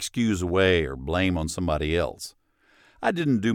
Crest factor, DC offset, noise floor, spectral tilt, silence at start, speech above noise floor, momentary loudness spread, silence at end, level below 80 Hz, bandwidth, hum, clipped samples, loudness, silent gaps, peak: 16 dB; under 0.1%; -61 dBFS; -5.5 dB/octave; 0 s; 37 dB; 8 LU; 0 s; -40 dBFS; 16.5 kHz; none; under 0.1%; -25 LUFS; none; -10 dBFS